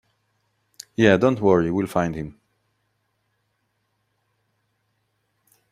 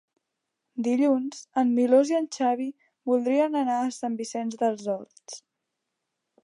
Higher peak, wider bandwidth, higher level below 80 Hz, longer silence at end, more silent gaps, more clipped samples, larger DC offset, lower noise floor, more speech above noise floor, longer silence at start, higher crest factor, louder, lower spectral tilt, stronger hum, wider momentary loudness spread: first, -2 dBFS vs -8 dBFS; first, 15 kHz vs 11 kHz; first, -56 dBFS vs -84 dBFS; first, 3.4 s vs 1.05 s; neither; neither; neither; second, -72 dBFS vs -83 dBFS; second, 53 dB vs 58 dB; first, 1 s vs 0.75 s; first, 24 dB vs 18 dB; first, -20 LUFS vs -26 LUFS; first, -6.5 dB/octave vs -4.5 dB/octave; neither; about the same, 17 LU vs 16 LU